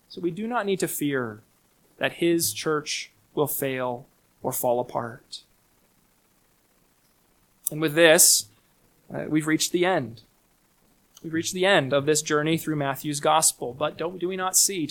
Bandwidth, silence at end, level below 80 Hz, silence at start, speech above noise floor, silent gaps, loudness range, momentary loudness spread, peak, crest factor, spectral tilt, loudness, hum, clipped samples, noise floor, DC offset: 19 kHz; 0 s; -66 dBFS; 0.1 s; 40 dB; none; 11 LU; 15 LU; -2 dBFS; 24 dB; -3 dB/octave; -23 LUFS; none; under 0.1%; -64 dBFS; under 0.1%